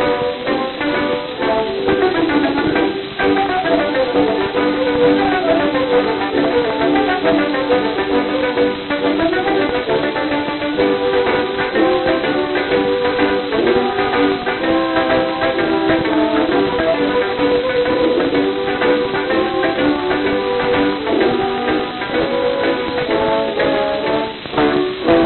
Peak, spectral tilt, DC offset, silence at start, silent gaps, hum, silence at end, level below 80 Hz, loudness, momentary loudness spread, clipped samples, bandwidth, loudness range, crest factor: 0 dBFS; -9.5 dB/octave; under 0.1%; 0 s; none; none; 0 s; -42 dBFS; -16 LUFS; 3 LU; under 0.1%; 4.3 kHz; 2 LU; 16 dB